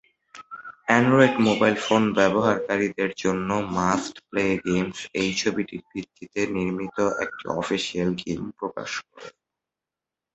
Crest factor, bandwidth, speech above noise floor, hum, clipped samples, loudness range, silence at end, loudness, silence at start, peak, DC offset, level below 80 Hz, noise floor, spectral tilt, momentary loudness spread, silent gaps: 22 dB; 8.2 kHz; 65 dB; none; under 0.1%; 7 LU; 1.05 s; -24 LUFS; 0.35 s; -2 dBFS; under 0.1%; -56 dBFS; -88 dBFS; -5 dB/octave; 14 LU; none